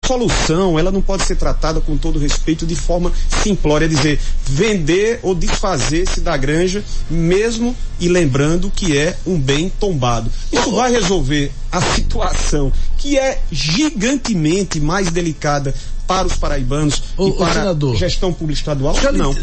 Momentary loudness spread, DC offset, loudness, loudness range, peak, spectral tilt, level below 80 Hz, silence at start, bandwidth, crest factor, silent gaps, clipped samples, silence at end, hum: 5 LU; under 0.1%; -17 LUFS; 1 LU; -4 dBFS; -5 dB/octave; -18 dBFS; 0 s; 8.8 kHz; 10 dB; none; under 0.1%; 0 s; none